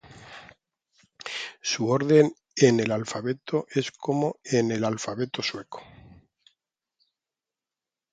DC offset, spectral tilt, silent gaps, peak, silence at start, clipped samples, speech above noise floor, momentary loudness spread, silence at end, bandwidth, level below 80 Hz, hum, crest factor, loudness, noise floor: under 0.1%; -5 dB/octave; none; -4 dBFS; 0.1 s; under 0.1%; over 66 dB; 22 LU; 2.3 s; 9.4 kHz; -66 dBFS; none; 22 dB; -25 LUFS; under -90 dBFS